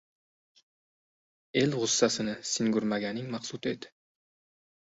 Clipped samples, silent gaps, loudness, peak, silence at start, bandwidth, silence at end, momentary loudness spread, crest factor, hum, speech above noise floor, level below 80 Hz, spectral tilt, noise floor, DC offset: under 0.1%; none; -29 LUFS; -10 dBFS; 1.55 s; 8 kHz; 1 s; 10 LU; 22 dB; none; over 60 dB; -70 dBFS; -3.5 dB/octave; under -90 dBFS; under 0.1%